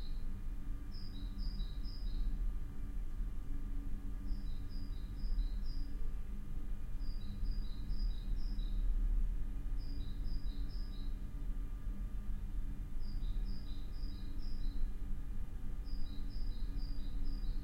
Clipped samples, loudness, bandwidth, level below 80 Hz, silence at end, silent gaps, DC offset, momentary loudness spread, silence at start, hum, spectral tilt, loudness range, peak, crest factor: under 0.1%; -46 LUFS; 5.6 kHz; -38 dBFS; 0 s; none; under 0.1%; 5 LU; 0 s; none; -7 dB/octave; 3 LU; -24 dBFS; 12 dB